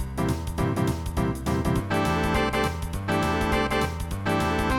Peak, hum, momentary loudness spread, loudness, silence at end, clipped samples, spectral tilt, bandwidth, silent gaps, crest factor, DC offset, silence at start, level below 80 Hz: -10 dBFS; none; 4 LU; -26 LUFS; 0 s; under 0.1%; -6 dB/octave; 17.5 kHz; none; 14 dB; under 0.1%; 0 s; -34 dBFS